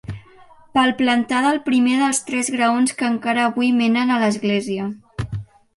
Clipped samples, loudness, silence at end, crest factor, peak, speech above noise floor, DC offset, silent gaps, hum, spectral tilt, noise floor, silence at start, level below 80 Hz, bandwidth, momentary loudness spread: under 0.1%; -19 LUFS; 0.3 s; 16 dB; -4 dBFS; 29 dB; under 0.1%; none; none; -4 dB/octave; -47 dBFS; 0.1 s; -50 dBFS; 11.5 kHz; 12 LU